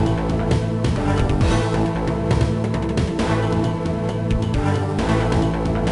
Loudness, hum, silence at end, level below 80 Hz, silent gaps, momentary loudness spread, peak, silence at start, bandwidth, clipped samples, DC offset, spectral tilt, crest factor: -21 LUFS; none; 0 s; -28 dBFS; none; 3 LU; -6 dBFS; 0 s; 11 kHz; under 0.1%; under 0.1%; -7 dB/octave; 14 dB